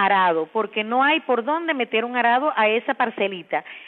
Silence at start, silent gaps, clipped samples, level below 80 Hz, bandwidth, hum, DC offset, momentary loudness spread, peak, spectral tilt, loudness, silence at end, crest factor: 0 s; none; under 0.1%; -86 dBFS; 4.3 kHz; none; under 0.1%; 6 LU; -6 dBFS; -7.5 dB/octave; -21 LUFS; 0 s; 16 dB